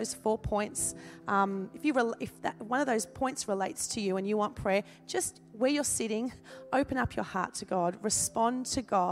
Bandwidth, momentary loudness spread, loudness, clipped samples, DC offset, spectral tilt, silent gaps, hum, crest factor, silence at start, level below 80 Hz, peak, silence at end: 16 kHz; 6 LU; -31 LUFS; under 0.1%; under 0.1%; -3.5 dB/octave; none; none; 18 dB; 0 s; -56 dBFS; -14 dBFS; 0 s